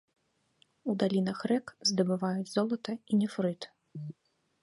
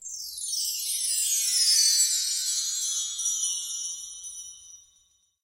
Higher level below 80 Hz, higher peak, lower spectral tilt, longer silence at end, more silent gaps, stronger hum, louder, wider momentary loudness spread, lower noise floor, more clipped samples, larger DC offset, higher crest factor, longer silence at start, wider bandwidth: second, -78 dBFS vs -72 dBFS; second, -14 dBFS vs -10 dBFS; first, -5.5 dB/octave vs 7 dB/octave; second, 0.5 s vs 0.65 s; neither; neither; second, -31 LUFS vs -24 LUFS; second, 15 LU vs 18 LU; first, -74 dBFS vs -66 dBFS; neither; neither; about the same, 18 dB vs 20 dB; first, 0.85 s vs 0 s; second, 11.5 kHz vs 16.5 kHz